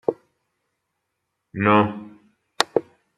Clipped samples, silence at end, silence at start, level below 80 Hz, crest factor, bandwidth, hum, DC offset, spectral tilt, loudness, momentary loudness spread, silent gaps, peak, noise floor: under 0.1%; 0.35 s; 0.1 s; -66 dBFS; 24 dB; 13.5 kHz; none; under 0.1%; -5 dB/octave; -21 LUFS; 20 LU; none; 0 dBFS; -78 dBFS